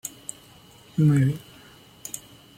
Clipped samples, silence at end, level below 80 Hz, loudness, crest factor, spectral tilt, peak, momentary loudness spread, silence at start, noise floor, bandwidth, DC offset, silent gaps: under 0.1%; 0.4 s; -60 dBFS; -25 LUFS; 16 dB; -6.5 dB/octave; -10 dBFS; 19 LU; 0.05 s; -51 dBFS; 16.5 kHz; under 0.1%; none